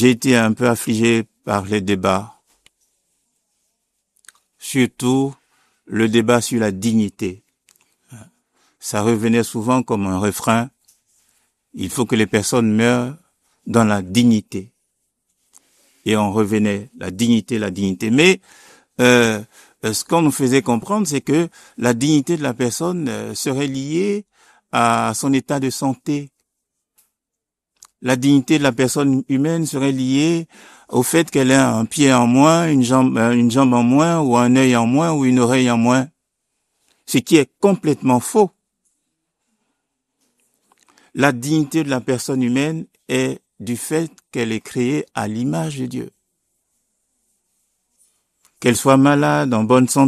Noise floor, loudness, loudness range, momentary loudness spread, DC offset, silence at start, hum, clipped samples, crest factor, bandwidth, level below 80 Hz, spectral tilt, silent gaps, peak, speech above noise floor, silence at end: -83 dBFS; -17 LUFS; 9 LU; 11 LU; under 0.1%; 0 s; none; under 0.1%; 18 dB; 14 kHz; -58 dBFS; -5 dB/octave; none; 0 dBFS; 66 dB; 0 s